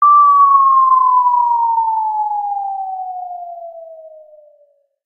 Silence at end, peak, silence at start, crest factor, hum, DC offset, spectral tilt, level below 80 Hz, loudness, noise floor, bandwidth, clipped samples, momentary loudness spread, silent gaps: 1 s; -2 dBFS; 0 s; 12 dB; none; under 0.1%; -2 dB/octave; -72 dBFS; -12 LUFS; -55 dBFS; 2.4 kHz; under 0.1%; 20 LU; none